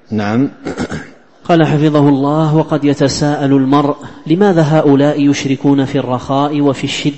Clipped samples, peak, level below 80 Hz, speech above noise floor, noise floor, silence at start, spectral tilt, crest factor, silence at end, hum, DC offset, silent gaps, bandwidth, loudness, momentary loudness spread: under 0.1%; 0 dBFS; -46 dBFS; 21 dB; -33 dBFS; 0.1 s; -6.5 dB/octave; 12 dB; 0 s; none; 0.9%; none; 8.6 kHz; -12 LUFS; 10 LU